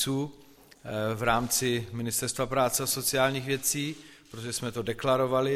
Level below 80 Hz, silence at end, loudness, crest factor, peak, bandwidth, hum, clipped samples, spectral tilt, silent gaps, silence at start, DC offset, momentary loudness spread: -56 dBFS; 0 s; -28 LUFS; 18 dB; -10 dBFS; 16.5 kHz; none; under 0.1%; -3.5 dB/octave; none; 0 s; under 0.1%; 12 LU